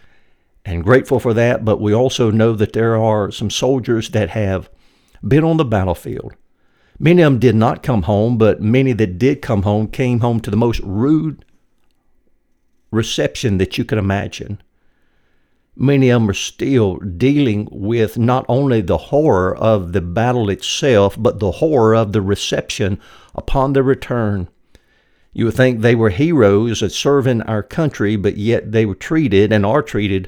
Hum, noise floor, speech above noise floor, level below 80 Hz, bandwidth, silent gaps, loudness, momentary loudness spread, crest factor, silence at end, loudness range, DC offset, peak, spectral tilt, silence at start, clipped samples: none; -58 dBFS; 43 dB; -38 dBFS; 16.5 kHz; none; -16 LUFS; 8 LU; 16 dB; 0 s; 5 LU; under 0.1%; 0 dBFS; -6.5 dB/octave; 0.65 s; under 0.1%